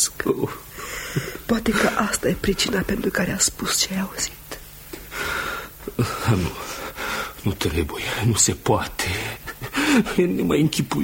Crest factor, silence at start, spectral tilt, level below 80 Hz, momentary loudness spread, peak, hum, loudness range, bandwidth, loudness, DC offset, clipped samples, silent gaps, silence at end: 18 dB; 0 s; -3.5 dB/octave; -40 dBFS; 13 LU; -4 dBFS; none; 5 LU; 17 kHz; -23 LUFS; under 0.1%; under 0.1%; none; 0 s